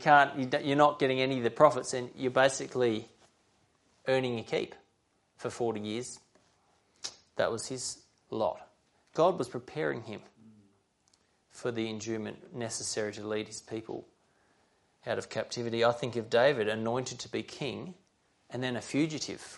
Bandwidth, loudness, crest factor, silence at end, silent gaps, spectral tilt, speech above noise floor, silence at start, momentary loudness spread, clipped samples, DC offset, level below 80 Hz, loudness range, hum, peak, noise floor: 11.5 kHz; -31 LUFS; 24 dB; 0 s; none; -4.5 dB/octave; 42 dB; 0 s; 17 LU; under 0.1%; under 0.1%; -74 dBFS; 9 LU; none; -8 dBFS; -73 dBFS